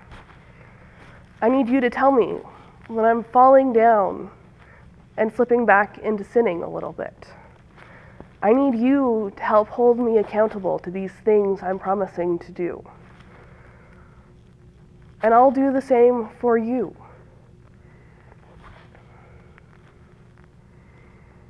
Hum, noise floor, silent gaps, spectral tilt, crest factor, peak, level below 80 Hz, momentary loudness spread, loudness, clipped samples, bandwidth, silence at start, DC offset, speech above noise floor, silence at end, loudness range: none; -50 dBFS; none; -8 dB/octave; 20 dB; -2 dBFS; -54 dBFS; 15 LU; -20 LUFS; under 0.1%; 9 kHz; 0.1 s; under 0.1%; 31 dB; 2.8 s; 9 LU